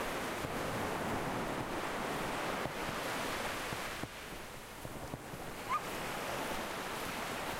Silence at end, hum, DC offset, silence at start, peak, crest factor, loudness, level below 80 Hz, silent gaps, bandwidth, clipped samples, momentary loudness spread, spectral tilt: 0 s; none; under 0.1%; 0 s; -22 dBFS; 18 dB; -39 LUFS; -56 dBFS; none; 16 kHz; under 0.1%; 8 LU; -3.5 dB/octave